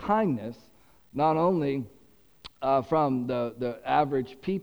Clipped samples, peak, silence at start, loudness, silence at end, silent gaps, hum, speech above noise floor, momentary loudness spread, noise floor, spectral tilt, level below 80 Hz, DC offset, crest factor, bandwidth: under 0.1%; -10 dBFS; 0 s; -27 LUFS; 0 s; none; none; 28 dB; 10 LU; -55 dBFS; -8.5 dB/octave; -60 dBFS; under 0.1%; 18 dB; over 20 kHz